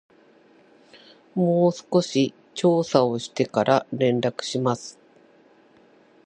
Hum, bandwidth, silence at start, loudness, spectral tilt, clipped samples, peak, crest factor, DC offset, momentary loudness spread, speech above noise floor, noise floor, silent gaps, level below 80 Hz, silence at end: none; 9.6 kHz; 1.35 s; -23 LUFS; -6 dB/octave; under 0.1%; -2 dBFS; 22 dB; under 0.1%; 6 LU; 34 dB; -56 dBFS; none; -68 dBFS; 1.35 s